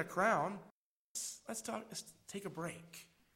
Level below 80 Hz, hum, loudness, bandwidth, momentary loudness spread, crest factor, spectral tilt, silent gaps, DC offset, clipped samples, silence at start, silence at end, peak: -78 dBFS; none; -41 LUFS; 16 kHz; 18 LU; 22 dB; -3.5 dB/octave; 0.71-1.15 s; under 0.1%; under 0.1%; 0 s; 0.3 s; -20 dBFS